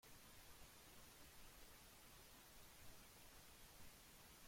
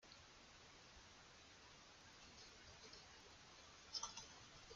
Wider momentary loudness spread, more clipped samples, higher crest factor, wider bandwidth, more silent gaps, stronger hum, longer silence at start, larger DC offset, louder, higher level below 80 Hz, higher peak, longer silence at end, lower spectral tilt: second, 0 LU vs 13 LU; neither; second, 16 dB vs 28 dB; first, 16.5 kHz vs 9 kHz; neither; neither; about the same, 0 s vs 0 s; neither; second, -64 LUFS vs -58 LUFS; about the same, -72 dBFS vs -76 dBFS; second, -48 dBFS vs -32 dBFS; about the same, 0 s vs 0 s; first, -2.5 dB/octave vs -1 dB/octave